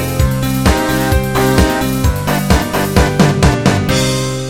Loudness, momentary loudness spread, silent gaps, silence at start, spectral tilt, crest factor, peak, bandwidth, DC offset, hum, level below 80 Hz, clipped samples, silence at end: -13 LUFS; 4 LU; none; 0 s; -5.5 dB/octave; 12 dB; 0 dBFS; 17.5 kHz; 1%; none; -20 dBFS; under 0.1%; 0 s